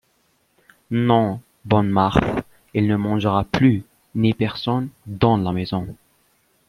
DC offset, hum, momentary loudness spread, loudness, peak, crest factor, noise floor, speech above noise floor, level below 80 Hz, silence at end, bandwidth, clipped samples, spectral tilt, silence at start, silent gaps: under 0.1%; none; 10 LU; -21 LUFS; -2 dBFS; 20 dB; -64 dBFS; 45 dB; -44 dBFS; 0.75 s; 13 kHz; under 0.1%; -8 dB/octave; 0.9 s; none